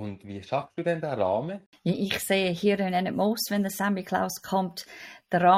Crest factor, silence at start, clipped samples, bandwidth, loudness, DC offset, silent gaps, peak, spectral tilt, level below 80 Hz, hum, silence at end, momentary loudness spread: 20 dB; 0 s; under 0.1%; 16 kHz; -28 LUFS; under 0.1%; 1.66-1.72 s; -8 dBFS; -5 dB/octave; -64 dBFS; none; 0 s; 12 LU